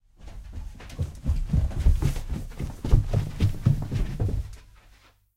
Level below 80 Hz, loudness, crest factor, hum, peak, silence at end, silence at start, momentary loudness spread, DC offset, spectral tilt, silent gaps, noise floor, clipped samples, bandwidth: -28 dBFS; -28 LUFS; 22 dB; none; -4 dBFS; 0.75 s; 0.2 s; 17 LU; under 0.1%; -7.5 dB/octave; none; -57 dBFS; under 0.1%; 15 kHz